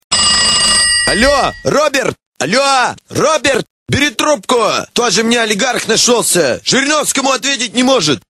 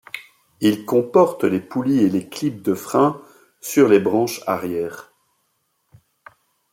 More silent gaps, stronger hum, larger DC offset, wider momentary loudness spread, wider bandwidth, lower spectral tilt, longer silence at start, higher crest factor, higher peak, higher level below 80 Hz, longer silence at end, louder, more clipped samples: first, 2.26-2.32 s, 3.70-3.86 s vs none; neither; neither; second, 6 LU vs 16 LU; about the same, 16 kHz vs 16.5 kHz; second, -2 dB/octave vs -6 dB/octave; about the same, 0.1 s vs 0.15 s; second, 12 dB vs 18 dB; about the same, 0 dBFS vs -2 dBFS; first, -38 dBFS vs -64 dBFS; second, 0.1 s vs 1.7 s; first, -11 LUFS vs -19 LUFS; neither